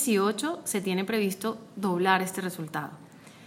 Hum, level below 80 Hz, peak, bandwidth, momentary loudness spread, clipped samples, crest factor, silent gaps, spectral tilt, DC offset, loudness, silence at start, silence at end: none; -76 dBFS; -8 dBFS; 16.5 kHz; 11 LU; under 0.1%; 22 dB; none; -4 dB/octave; under 0.1%; -28 LUFS; 0 s; 0 s